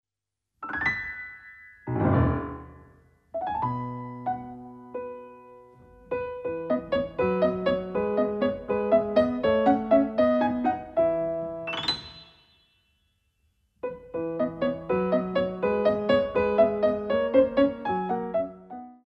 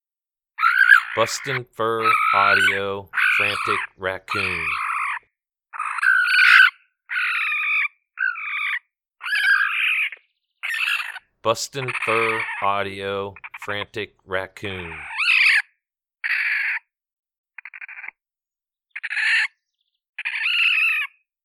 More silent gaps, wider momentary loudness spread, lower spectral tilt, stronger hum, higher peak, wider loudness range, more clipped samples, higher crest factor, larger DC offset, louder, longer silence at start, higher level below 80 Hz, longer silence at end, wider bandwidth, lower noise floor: second, none vs 17.13-17.23 s, 17.38-17.44 s, 20.09-20.13 s; about the same, 16 LU vs 17 LU; first, -8 dB/octave vs -2 dB/octave; neither; second, -8 dBFS vs 0 dBFS; about the same, 10 LU vs 8 LU; neither; about the same, 20 dB vs 22 dB; neither; second, -26 LUFS vs -19 LUFS; about the same, 0.6 s vs 0.6 s; first, -50 dBFS vs -64 dBFS; second, 0.1 s vs 0.4 s; second, 8.6 kHz vs 17.5 kHz; about the same, -87 dBFS vs under -90 dBFS